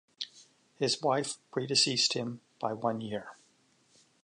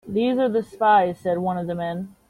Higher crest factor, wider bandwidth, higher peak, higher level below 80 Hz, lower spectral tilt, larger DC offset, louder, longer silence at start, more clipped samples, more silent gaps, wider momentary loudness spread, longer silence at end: about the same, 20 dB vs 16 dB; second, 11.5 kHz vs 13.5 kHz; second, -14 dBFS vs -6 dBFS; second, -76 dBFS vs -58 dBFS; second, -3 dB/octave vs -7.5 dB/octave; neither; second, -31 LUFS vs -22 LUFS; first, 0.2 s vs 0.05 s; neither; neither; first, 16 LU vs 10 LU; first, 0.9 s vs 0.2 s